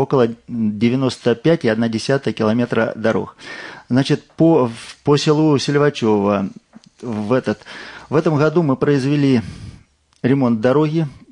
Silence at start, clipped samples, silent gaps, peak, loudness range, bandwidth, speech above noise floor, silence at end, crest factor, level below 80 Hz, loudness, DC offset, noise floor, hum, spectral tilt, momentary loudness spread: 0 s; under 0.1%; none; -2 dBFS; 2 LU; 10.5 kHz; 31 dB; 0.2 s; 14 dB; -54 dBFS; -17 LUFS; under 0.1%; -48 dBFS; none; -7 dB/octave; 12 LU